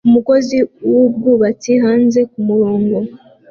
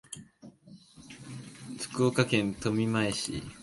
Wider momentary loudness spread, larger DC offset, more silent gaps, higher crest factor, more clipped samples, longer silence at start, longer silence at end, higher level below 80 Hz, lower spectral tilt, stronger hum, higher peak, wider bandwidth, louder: second, 5 LU vs 19 LU; neither; neither; second, 12 dB vs 24 dB; neither; about the same, 0.05 s vs 0.1 s; first, 0.35 s vs 0 s; about the same, -56 dBFS vs -58 dBFS; first, -7 dB/octave vs -5 dB/octave; neither; first, -2 dBFS vs -8 dBFS; second, 7 kHz vs 12 kHz; first, -13 LUFS vs -29 LUFS